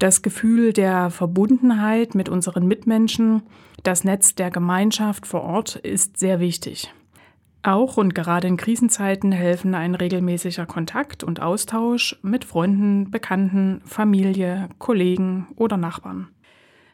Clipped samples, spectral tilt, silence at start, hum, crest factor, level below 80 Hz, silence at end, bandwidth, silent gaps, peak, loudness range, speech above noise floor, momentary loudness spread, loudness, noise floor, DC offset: under 0.1%; -5 dB/octave; 0 s; none; 20 dB; -58 dBFS; 0.65 s; 17.5 kHz; none; 0 dBFS; 4 LU; 34 dB; 9 LU; -20 LUFS; -54 dBFS; under 0.1%